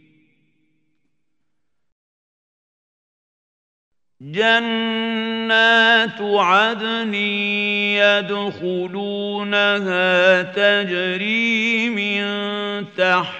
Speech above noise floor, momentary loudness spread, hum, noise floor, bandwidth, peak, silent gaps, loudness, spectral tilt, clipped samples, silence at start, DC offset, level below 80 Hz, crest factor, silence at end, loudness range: 61 dB; 10 LU; none; -79 dBFS; 8.6 kHz; 0 dBFS; none; -17 LUFS; -4.5 dB/octave; under 0.1%; 4.2 s; under 0.1%; -74 dBFS; 20 dB; 0 s; 7 LU